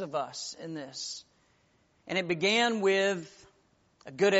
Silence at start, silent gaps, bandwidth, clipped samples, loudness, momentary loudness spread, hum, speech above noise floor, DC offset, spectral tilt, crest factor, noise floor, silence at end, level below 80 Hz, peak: 0 s; none; 8 kHz; under 0.1%; -30 LUFS; 16 LU; none; 39 dB; under 0.1%; -2 dB/octave; 20 dB; -68 dBFS; 0 s; -76 dBFS; -12 dBFS